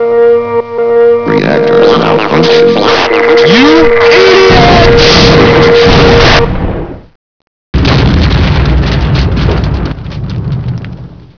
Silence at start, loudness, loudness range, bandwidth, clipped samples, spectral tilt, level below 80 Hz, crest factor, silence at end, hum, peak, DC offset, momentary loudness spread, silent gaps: 0 s; -6 LUFS; 7 LU; 5.4 kHz; 5%; -6 dB/octave; -16 dBFS; 6 dB; 0.1 s; none; 0 dBFS; 2%; 13 LU; 7.15-7.73 s